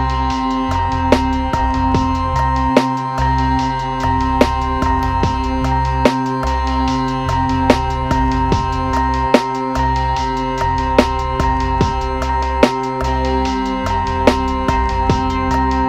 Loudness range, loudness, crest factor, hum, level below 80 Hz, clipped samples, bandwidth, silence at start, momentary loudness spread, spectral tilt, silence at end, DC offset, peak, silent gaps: 1 LU; -17 LUFS; 16 dB; none; -24 dBFS; under 0.1%; 13.5 kHz; 0 s; 4 LU; -6.5 dB/octave; 0 s; under 0.1%; 0 dBFS; none